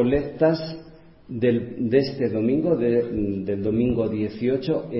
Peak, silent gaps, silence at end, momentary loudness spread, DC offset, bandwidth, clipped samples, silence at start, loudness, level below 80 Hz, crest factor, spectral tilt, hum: -6 dBFS; none; 0 s; 5 LU; under 0.1%; 5.8 kHz; under 0.1%; 0 s; -23 LUFS; -46 dBFS; 18 dB; -11.5 dB/octave; none